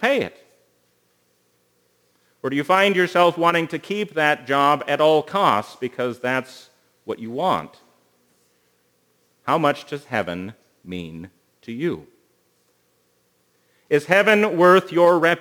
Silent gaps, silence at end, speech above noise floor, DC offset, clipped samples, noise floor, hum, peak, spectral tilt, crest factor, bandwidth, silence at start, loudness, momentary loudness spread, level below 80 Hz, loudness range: none; 0 s; 45 dB; under 0.1%; under 0.1%; -65 dBFS; 60 Hz at -55 dBFS; 0 dBFS; -5.5 dB/octave; 22 dB; over 20 kHz; 0 s; -19 LUFS; 18 LU; -68 dBFS; 12 LU